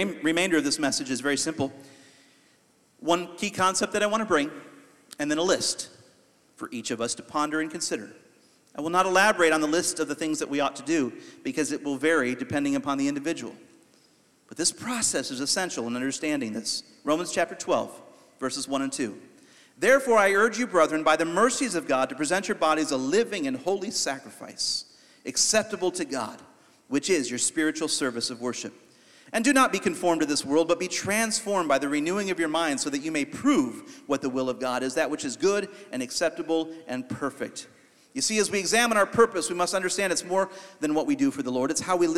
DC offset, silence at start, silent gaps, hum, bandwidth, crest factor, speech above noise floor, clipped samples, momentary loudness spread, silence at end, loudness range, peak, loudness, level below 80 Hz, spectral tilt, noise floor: under 0.1%; 0 s; none; none; 15.5 kHz; 20 dB; 37 dB; under 0.1%; 11 LU; 0 s; 5 LU; -6 dBFS; -26 LUFS; -66 dBFS; -2.5 dB/octave; -63 dBFS